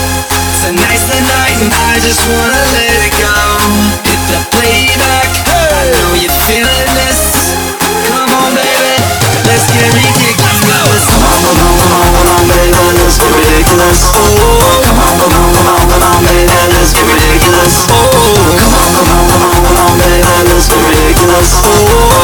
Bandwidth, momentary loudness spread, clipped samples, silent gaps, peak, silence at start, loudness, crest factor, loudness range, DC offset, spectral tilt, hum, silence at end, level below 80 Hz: over 20 kHz; 3 LU; 0.6%; none; 0 dBFS; 0 s; -7 LUFS; 6 dB; 2 LU; under 0.1%; -3.5 dB/octave; none; 0 s; -16 dBFS